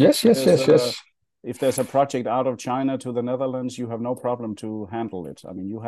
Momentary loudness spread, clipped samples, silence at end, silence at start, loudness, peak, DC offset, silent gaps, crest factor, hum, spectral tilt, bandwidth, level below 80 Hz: 17 LU; under 0.1%; 0 s; 0 s; -23 LUFS; -4 dBFS; under 0.1%; none; 18 dB; none; -5.5 dB/octave; 12.5 kHz; -68 dBFS